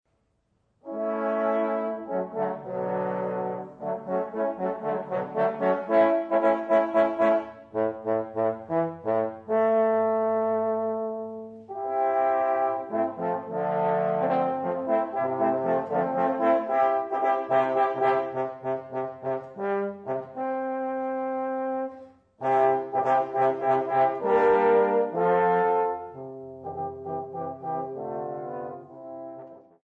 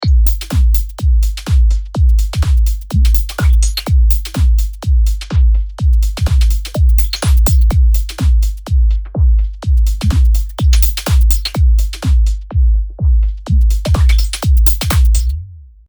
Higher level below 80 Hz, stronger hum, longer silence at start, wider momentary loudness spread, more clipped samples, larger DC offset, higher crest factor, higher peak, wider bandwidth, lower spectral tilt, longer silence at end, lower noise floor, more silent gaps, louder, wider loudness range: second, -70 dBFS vs -12 dBFS; neither; first, 0.85 s vs 0 s; first, 12 LU vs 4 LU; neither; neither; about the same, 16 dB vs 12 dB; second, -10 dBFS vs 0 dBFS; second, 4.9 kHz vs over 20 kHz; first, -8.5 dB/octave vs -5.5 dB/octave; about the same, 0.25 s vs 0.25 s; first, -71 dBFS vs -31 dBFS; neither; second, -26 LUFS vs -14 LUFS; first, 7 LU vs 1 LU